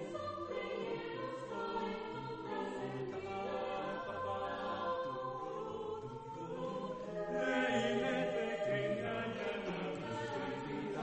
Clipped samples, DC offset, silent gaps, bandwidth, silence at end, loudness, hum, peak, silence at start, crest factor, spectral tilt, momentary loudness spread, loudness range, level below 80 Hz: under 0.1%; under 0.1%; none; 8.4 kHz; 0 s; -40 LUFS; none; -22 dBFS; 0 s; 18 dB; -5.5 dB/octave; 8 LU; 5 LU; -66 dBFS